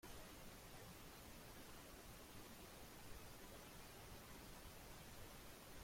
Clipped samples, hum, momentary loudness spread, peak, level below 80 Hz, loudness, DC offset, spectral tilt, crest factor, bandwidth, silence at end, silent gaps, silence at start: under 0.1%; none; 1 LU; -44 dBFS; -66 dBFS; -59 LUFS; under 0.1%; -3.5 dB/octave; 14 dB; 16.5 kHz; 0 s; none; 0 s